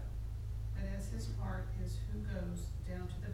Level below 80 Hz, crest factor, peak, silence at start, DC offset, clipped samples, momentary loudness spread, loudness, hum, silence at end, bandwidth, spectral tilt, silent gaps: -42 dBFS; 12 dB; -28 dBFS; 0 s; under 0.1%; under 0.1%; 2 LU; -42 LUFS; none; 0 s; 14 kHz; -7 dB/octave; none